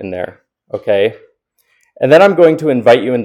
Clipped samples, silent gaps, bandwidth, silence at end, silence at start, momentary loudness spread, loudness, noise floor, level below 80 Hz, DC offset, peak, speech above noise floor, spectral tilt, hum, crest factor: 0.5%; none; 11.5 kHz; 0 s; 0 s; 16 LU; -11 LUFS; -60 dBFS; -62 dBFS; under 0.1%; 0 dBFS; 49 dB; -6.5 dB/octave; none; 12 dB